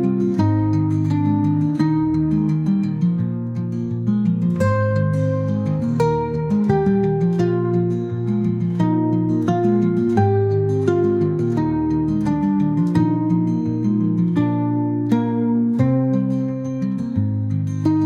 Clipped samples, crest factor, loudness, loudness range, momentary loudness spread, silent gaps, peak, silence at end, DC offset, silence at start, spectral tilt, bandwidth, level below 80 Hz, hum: under 0.1%; 14 dB; -19 LUFS; 2 LU; 4 LU; none; -4 dBFS; 0 s; under 0.1%; 0 s; -10 dB/octave; 8.4 kHz; -48 dBFS; none